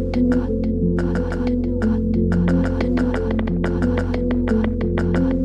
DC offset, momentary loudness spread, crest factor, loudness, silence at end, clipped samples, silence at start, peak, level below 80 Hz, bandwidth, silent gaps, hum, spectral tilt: under 0.1%; 3 LU; 14 dB; -20 LUFS; 0 s; under 0.1%; 0 s; -6 dBFS; -28 dBFS; 8.2 kHz; none; none; -9 dB/octave